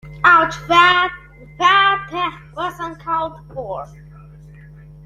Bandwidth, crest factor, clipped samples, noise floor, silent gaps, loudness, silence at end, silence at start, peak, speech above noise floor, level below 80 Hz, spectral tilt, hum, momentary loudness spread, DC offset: 13 kHz; 18 dB; under 0.1%; -40 dBFS; none; -15 LUFS; 0.85 s; 0.05 s; 0 dBFS; 21 dB; -46 dBFS; -3.5 dB/octave; none; 18 LU; under 0.1%